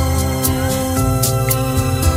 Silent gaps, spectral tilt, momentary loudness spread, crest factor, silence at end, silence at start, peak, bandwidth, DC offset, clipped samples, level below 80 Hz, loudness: none; -5 dB/octave; 2 LU; 14 dB; 0 s; 0 s; -2 dBFS; 16.5 kHz; under 0.1%; under 0.1%; -24 dBFS; -17 LUFS